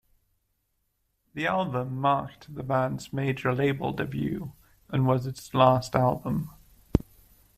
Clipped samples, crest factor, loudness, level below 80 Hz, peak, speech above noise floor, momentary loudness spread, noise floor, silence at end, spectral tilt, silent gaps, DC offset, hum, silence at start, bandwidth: under 0.1%; 24 dB; -27 LUFS; -46 dBFS; -4 dBFS; 49 dB; 11 LU; -75 dBFS; 0.6 s; -7 dB/octave; none; under 0.1%; none; 1.35 s; 15 kHz